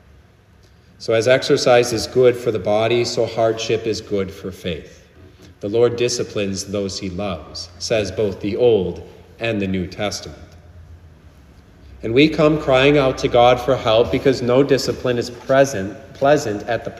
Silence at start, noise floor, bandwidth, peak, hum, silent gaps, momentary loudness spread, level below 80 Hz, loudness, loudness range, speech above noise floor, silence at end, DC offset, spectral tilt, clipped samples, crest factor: 1 s; -50 dBFS; 14.5 kHz; -2 dBFS; none; none; 13 LU; -44 dBFS; -18 LUFS; 7 LU; 32 dB; 0 s; under 0.1%; -5 dB/octave; under 0.1%; 18 dB